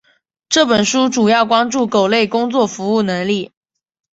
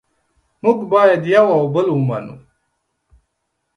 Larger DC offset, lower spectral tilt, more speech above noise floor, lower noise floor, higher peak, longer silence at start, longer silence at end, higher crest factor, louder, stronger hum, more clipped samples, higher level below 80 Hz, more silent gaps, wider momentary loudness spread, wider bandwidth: neither; second, -3.5 dB/octave vs -8 dB/octave; second, 28 dB vs 58 dB; second, -43 dBFS vs -72 dBFS; about the same, 0 dBFS vs 0 dBFS; second, 0.5 s vs 0.65 s; second, 0.65 s vs 1.4 s; about the same, 16 dB vs 18 dB; about the same, -15 LUFS vs -15 LUFS; neither; neither; about the same, -56 dBFS vs -60 dBFS; neither; second, 6 LU vs 10 LU; second, 8 kHz vs 9.8 kHz